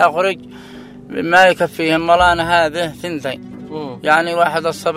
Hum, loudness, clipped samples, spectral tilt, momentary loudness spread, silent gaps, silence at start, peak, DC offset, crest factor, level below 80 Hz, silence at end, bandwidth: none; -15 LUFS; under 0.1%; -4.5 dB/octave; 18 LU; none; 0 s; 0 dBFS; under 0.1%; 16 dB; -42 dBFS; 0 s; 16 kHz